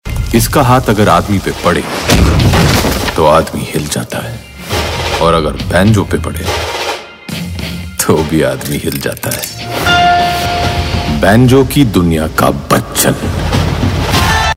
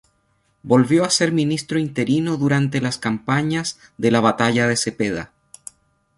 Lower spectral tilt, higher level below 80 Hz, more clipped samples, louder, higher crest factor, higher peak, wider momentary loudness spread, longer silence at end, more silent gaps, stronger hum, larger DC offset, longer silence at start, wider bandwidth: about the same, -5 dB/octave vs -5 dB/octave; first, -24 dBFS vs -56 dBFS; first, 0.3% vs under 0.1%; first, -11 LUFS vs -19 LUFS; second, 12 dB vs 18 dB; about the same, 0 dBFS vs -2 dBFS; second, 10 LU vs 13 LU; second, 0 s vs 0.9 s; neither; neither; neither; second, 0.05 s vs 0.65 s; first, 16.5 kHz vs 11.5 kHz